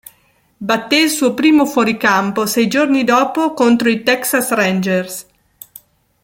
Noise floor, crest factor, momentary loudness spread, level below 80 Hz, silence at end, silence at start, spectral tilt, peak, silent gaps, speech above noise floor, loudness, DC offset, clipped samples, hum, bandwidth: -56 dBFS; 14 dB; 7 LU; -58 dBFS; 1 s; 0.6 s; -4 dB/octave; -2 dBFS; none; 42 dB; -14 LUFS; under 0.1%; under 0.1%; none; 17 kHz